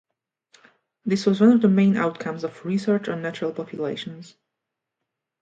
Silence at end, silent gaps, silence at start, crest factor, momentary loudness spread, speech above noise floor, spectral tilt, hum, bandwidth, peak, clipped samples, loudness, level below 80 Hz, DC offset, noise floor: 1.2 s; none; 1.05 s; 18 dB; 15 LU; 62 dB; -7.5 dB/octave; none; 7.8 kHz; -6 dBFS; under 0.1%; -22 LUFS; -70 dBFS; under 0.1%; -83 dBFS